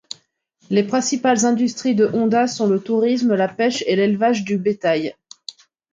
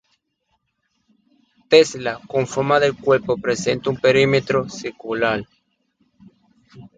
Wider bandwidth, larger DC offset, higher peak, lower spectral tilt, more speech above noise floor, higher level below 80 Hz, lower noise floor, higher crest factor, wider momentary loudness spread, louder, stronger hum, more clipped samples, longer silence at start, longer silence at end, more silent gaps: about the same, 9.4 kHz vs 9.2 kHz; neither; second, -4 dBFS vs 0 dBFS; about the same, -4.5 dB/octave vs -4.5 dB/octave; second, 42 dB vs 52 dB; second, -66 dBFS vs -54 dBFS; second, -60 dBFS vs -71 dBFS; about the same, 16 dB vs 20 dB; first, 18 LU vs 12 LU; about the same, -18 LUFS vs -19 LUFS; neither; neither; second, 0.7 s vs 1.7 s; first, 0.8 s vs 0.1 s; neither